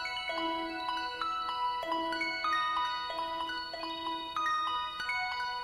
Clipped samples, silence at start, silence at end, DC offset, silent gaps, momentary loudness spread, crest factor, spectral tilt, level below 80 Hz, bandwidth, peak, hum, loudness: under 0.1%; 0 s; 0 s; under 0.1%; none; 6 LU; 14 dB; -2 dB/octave; -64 dBFS; 15.5 kHz; -20 dBFS; none; -33 LUFS